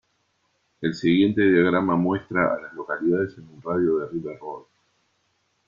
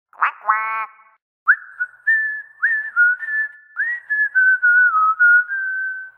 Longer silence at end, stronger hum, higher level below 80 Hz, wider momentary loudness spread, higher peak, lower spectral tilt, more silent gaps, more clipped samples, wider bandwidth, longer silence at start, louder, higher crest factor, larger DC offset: first, 1.05 s vs 0.1 s; neither; first, -62 dBFS vs -84 dBFS; first, 16 LU vs 11 LU; second, -8 dBFS vs -2 dBFS; first, -7.5 dB/octave vs -0.5 dB/octave; second, none vs 1.22-1.46 s; neither; first, 7.2 kHz vs 3.5 kHz; first, 0.8 s vs 0.2 s; second, -23 LUFS vs -17 LUFS; about the same, 16 dB vs 16 dB; neither